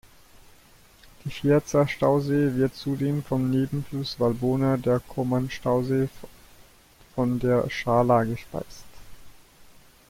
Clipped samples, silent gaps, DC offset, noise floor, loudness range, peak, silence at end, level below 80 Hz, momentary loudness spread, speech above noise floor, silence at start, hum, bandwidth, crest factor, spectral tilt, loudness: under 0.1%; none; under 0.1%; -54 dBFS; 2 LU; -8 dBFS; 0.45 s; -50 dBFS; 10 LU; 30 dB; 1.25 s; none; 16.5 kHz; 18 dB; -7 dB/octave; -25 LUFS